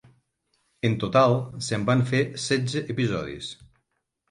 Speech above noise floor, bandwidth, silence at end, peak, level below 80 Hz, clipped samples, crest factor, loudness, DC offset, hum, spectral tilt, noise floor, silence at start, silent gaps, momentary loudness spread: 53 dB; 11.5 kHz; 0.65 s; -6 dBFS; -56 dBFS; under 0.1%; 20 dB; -25 LUFS; under 0.1%; none; -5.5 dB/octave; -77 dBFS; 0.85 s; none; 11 LU